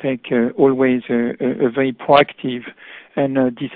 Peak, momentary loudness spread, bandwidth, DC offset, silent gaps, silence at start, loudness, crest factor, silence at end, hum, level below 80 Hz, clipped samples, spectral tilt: 0 dBFS; 12 LU; 4.9 kHz; under 0.1%; none; 0 s; -17 LUFS; 18 dB; 0 s; none; -58 dBFS; under 0.1%; -10 dB/octave